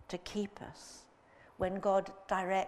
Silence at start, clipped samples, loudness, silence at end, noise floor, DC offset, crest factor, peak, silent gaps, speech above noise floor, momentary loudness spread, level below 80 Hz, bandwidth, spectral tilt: 0 s; under 0.1%; -36 LUFS; 0 s; -62 dBFS; under 0.1%; 18 dB; -18 dBFS; none; 26 dB; 19 LU; -62 dBFS; 13 kHz; -5 dB/octave